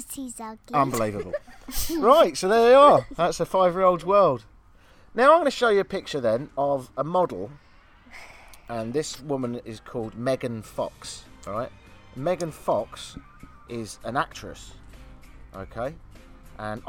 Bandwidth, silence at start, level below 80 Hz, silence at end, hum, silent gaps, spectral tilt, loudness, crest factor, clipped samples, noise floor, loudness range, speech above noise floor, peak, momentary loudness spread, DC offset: 19 kHz; 0 s; -48 dBFS; 0 s; none; none; -5 dB/octave; -23 LUFS; 20 dB; under 0.1%; -53 dBFS; 13 LU; 29 dB; -4 dBFS; 21 LU; under 0.1%